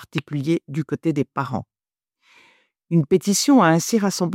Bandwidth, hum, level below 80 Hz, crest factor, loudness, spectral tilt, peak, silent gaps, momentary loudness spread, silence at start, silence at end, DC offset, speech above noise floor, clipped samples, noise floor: 16.5 kHz; none; -64 dBFS; 16 dB; -20 LUFS; -5 dB/octave; -4 dBFS; none; 12 LU; 0 s; 0 s; under 0.1%; 63 dB; under 0.1%; -82 dBFS